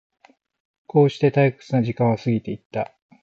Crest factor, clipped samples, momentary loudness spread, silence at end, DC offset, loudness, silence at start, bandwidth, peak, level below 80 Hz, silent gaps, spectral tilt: 16 dB; under 0.1%; 11 LU; 0.4 s; under 0.1%; -21 LUFS; 0.95 s; 7.6 kHz; -6 dBFS; -60 dBFS; 2.66-2.70 s; -8.5 dB/octave